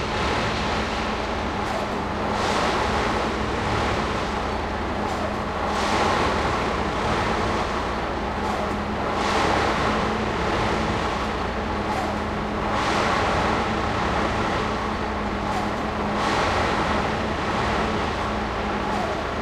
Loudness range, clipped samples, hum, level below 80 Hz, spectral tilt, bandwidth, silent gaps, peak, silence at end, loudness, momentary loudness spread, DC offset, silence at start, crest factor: 1 LU; under 0.1%; none; -36 dBFS; -5 dB/octave; 14.5 kHz; none; -8 dBFS; 0 s; -24 LUFS; 5 LU; under 0.1%; 0 s; 14 dB